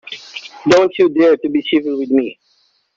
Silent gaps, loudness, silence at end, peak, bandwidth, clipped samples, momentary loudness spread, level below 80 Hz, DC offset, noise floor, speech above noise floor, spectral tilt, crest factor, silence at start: none; -14 LUFS; 0.65 s; -2 dBFS; 7.8 kHz; under 0.1%; 17 LU; -58 dBFS; under 0.1%; -59 dBFS; 46 dB; -5 dB/octave; 14 dB; 0.05 s